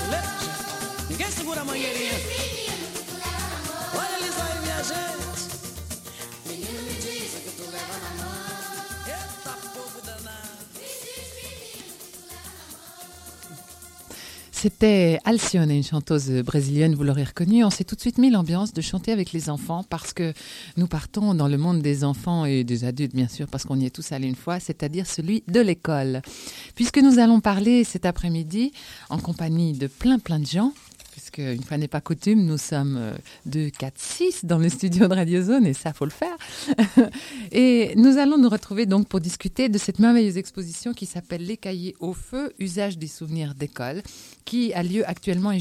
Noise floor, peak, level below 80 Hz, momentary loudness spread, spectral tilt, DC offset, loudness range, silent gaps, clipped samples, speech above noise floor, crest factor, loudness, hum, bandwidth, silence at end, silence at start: -45 dBFS; -4 dBFS; -46 dBFS; 18 LU; -5.5 dB/octave; under 0.1%; 14 LU; none; under 0.1%; 23 dB; 20 dB; -23 LUFS; none; 16 kHz; 0 s; 0 s